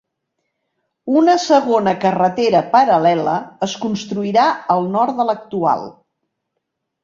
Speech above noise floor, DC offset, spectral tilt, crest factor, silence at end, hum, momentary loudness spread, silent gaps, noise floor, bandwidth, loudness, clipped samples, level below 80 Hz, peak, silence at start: 60 dB; under 0.1%; -5.5 dB/octave; 16 dB; 1.1 s; none; 9 LU; none; -76 dBFS; 7.6 kHz; -16 LUFS; under 0.1%; -62 dBFS; -2 dBFS; 1.05 s